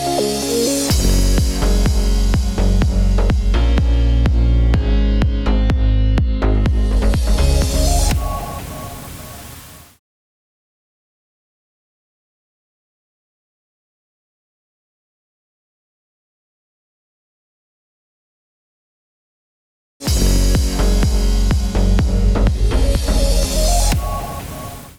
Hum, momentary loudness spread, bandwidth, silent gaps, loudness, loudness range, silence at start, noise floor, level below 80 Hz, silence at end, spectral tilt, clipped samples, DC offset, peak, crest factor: none; 12 LU; 17 kHz; 9.99-20.00 s; -17 LUFS; 9 LU; 0 s; -38 dBFS; -18 dBFS; 0.1 s; -5 dB/octave; under 0.1%; 0.4%; -4 dBFS; 14 dB